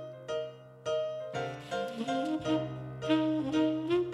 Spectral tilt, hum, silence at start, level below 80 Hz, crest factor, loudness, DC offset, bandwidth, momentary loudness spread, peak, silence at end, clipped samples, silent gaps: -6 dB/octave; none; 0 s; -66 dBFS; 18 dB; -33 LUFS; under 0.1%; 11 kHz; 9 LU; -14 dBFS; 0 s; under 0.1%; none